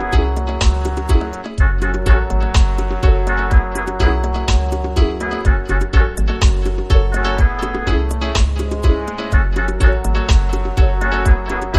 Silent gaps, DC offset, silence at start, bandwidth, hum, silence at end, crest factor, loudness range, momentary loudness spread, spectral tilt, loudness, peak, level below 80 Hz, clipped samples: none; under 0.1%; 0 s; 11.5 kHz; none; 0 s; 14 dB; 1 LU; 3 LU; -6 dB/octave; -17 LUFS; 0 dBFS; -16 dBFS; under 0.1%